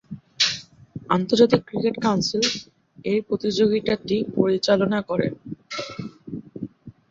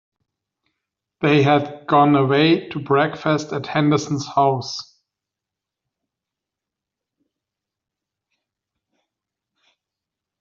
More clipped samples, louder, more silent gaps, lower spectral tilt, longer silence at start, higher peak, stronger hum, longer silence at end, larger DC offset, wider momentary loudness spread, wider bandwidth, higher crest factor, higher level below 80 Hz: neither; second, -22 LUFS vs -18 LUFS; neither; about the same, -4.5 dB/octave vs -5 dB/octave; second, 0.1 s vs 1.2 s; about the same, -2 dBFS vs -2 dBFS; neither; second, 0.2 s vs 5.6 s; neither; first, 18 LU vs 8 LU; about the same, 7.8 kHz vs 7.6 kHz; about the same, 20 dB vs 20 dB; first, -58 dBFS vs -64 dBFS